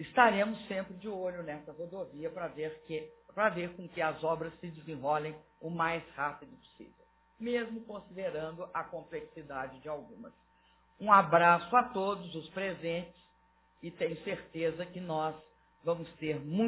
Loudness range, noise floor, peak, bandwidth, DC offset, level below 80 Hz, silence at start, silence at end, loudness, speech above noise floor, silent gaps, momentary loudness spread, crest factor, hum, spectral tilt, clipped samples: 10 LU; -68 dBFS; -8 dBFS; 4 kHz; under 0.1%; -68 dBFS; 0 s; 0 s; -34 LUFS; 35 dB; none; 18 LU; 26 dB; none; -4 dB/octave; under 0.1%